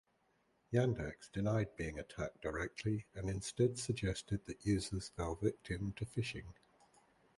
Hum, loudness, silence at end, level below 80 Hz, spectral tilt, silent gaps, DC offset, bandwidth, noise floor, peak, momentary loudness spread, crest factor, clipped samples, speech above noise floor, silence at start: none; -40 LUFS; 0.85 s; -56 dBFS; -6 dB/octave; none; under 0.1%; 11.5 kHz; -77 dBFS; -20 dBFS; 8 LU; 20 dB; under 0.1%; 38 dB; 0.7 s